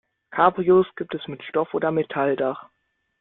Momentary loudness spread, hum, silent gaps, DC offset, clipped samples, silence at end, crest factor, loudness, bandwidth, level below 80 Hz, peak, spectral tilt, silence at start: 13 LU; none; none; under 0.1%; under 0.1%; 0.6 s; 20 dB; -23 LUFS; 4 kHz; -64 dBFS; -2 dBFS; -11 dB/octave; 0.3 s